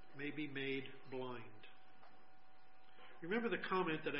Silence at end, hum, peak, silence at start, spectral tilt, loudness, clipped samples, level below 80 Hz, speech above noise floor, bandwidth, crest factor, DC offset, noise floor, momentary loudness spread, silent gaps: 0 s; none; -26 dBFS; 0.05 s; -3.5 dB/octave; -43 LUFS; under 0.1%; -84 dBFS; 26 dB; 5.6 kHz; 20 dB; 0.3%; -69 dBFS; 23 LU; none